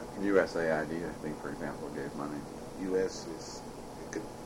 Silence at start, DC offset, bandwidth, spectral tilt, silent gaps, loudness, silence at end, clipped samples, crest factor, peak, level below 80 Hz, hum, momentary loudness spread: 0 s; under 0.1%; 16 kHz; -5 dB/octave; none; -35 LUFS; 0 s; under 0.1%; 22 dB; -12 dBFS; -56 dBFS; none; 14 LU